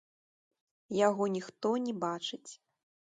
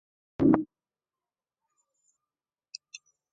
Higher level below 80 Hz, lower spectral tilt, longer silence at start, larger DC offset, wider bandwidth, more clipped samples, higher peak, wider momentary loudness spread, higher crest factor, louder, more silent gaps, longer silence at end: second, -80 dBFS vs -60 dBFS; second, -5 dB/octave vs -7 dB/octave; first, 0.9 s vs 0.4 s; neither; first, 9.4 kHz vs 7.6 kHz; neither; second, -14 dBFS vs -6 dBFS; second, 13 LU vs 25 LU; second, 20 dB vs 26 dB; second, -33 LUFS vs -26 LUFS; neither; second, 0.6 s vs 2.7 s